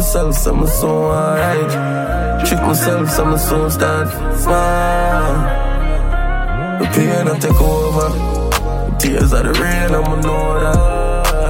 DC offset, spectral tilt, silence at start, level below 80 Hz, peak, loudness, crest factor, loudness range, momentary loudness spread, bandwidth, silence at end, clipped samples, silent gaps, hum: under 0.1%; -5.5 dB/octave; 0 s; -18 dBFS; 0 dBFS; -16 LUFS; 12 dB; 1 LU; 5 LU; 17 kHz; 0 s; under 0.1%; none; none